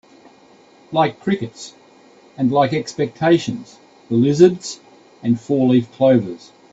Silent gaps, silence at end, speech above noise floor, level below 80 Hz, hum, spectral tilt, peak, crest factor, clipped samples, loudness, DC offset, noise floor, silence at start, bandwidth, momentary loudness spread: none; 0.35 s; 32 dB; -60 dBFS; none; -6.5 dB/octave; 0 dBFS; 18 dB; under 0.1%; -18 LUFS; under 0.1%; -49 dBFS; 0.9 s; 8 kHz; 17 LU